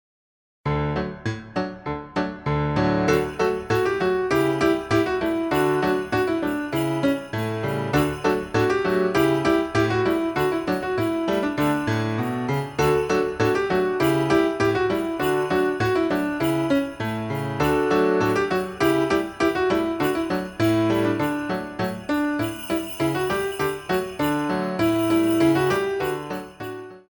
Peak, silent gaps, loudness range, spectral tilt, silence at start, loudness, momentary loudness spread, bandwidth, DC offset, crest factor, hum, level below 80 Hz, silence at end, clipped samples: -8 dBFS; none; 2 LU; -6 dB/octave; 0.65 s; -23 LUFS; 7 LU; over 20 kHz; under 0.1%; 14 dB; none; -46 dBFS; 0.1 s; under 0.1%